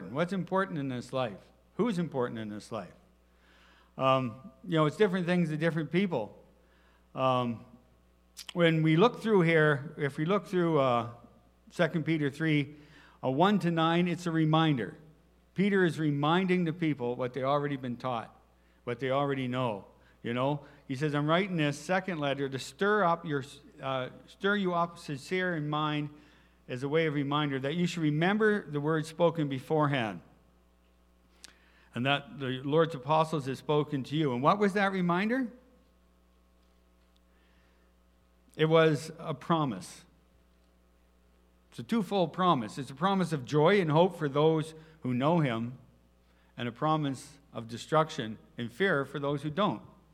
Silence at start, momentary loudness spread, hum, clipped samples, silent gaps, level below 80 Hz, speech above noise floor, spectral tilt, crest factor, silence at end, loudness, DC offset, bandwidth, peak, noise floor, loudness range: 0 s; 15 LU; none; under 0.1%; none; -66 dBFS; 35 dB; -6.5 dB/octave; 20 dB; 0.3 s; -30 LUFS; under 0.1%; 13 kHz; -10 dBFS; -65 dBFS; 6 LU